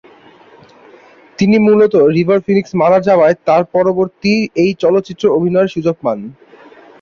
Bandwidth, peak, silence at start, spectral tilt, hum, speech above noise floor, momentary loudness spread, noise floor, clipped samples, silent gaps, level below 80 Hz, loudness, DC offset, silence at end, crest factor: 7 kHz; 0 dBFS; 1.4 s; -7.5 dB/octave; none; 31 dB; 7 LU; -43 dBFS; under 0.1%; none; -54 dBFS; -12 LUFS; under 0.1%; 0.7 s; 12 dB